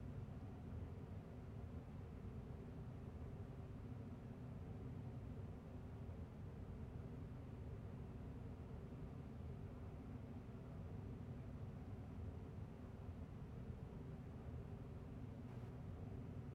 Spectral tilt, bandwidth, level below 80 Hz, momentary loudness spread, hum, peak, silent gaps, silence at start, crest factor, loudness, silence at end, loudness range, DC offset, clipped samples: -9 dB/octave; 12.5 kHz; -60 dBFS; 2 LU; none; -40 dBFS; none; 0 s; 12 dB; -54 LUFS; 0 s; 0 LU; under 0.1%; under 0.1%